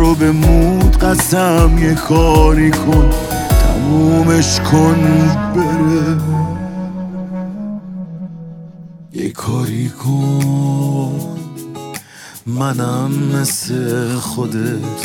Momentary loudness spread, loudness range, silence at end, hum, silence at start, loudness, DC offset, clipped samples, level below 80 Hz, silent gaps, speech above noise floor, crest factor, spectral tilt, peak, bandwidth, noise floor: 17 LU; 10 LU; 0 s; none; 0 s; -14 LUFS; under 0.1%; under 0.1%; -20 dBFS; none; 22 dB; 14 dB; -6 dB/octave; 0 dBFS; 18 kHz; -35 dBFS